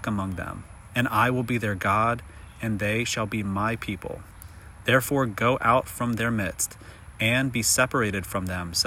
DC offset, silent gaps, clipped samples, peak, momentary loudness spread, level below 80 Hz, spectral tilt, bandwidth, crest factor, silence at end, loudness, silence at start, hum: under 0.1%; none; under 0.1%; -6 dBFS; 16 LU; -48 dBFS; -4 dB/octave; 16 kHz; 20 dB; 0 s; -25 LUFS; 0 s; none